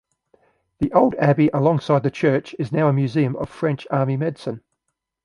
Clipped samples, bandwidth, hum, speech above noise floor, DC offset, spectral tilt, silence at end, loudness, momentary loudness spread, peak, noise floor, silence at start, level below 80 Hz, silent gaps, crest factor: under 0.1%; 10.5 kHz; none; 58 dB; under 0.1%; -8.5 dB/octave; 0.65 s; -20 LUFS; 9 LU; -2 dBFS; -78 dBFS; 0.8 s; -52 dBFS; none; 18 dB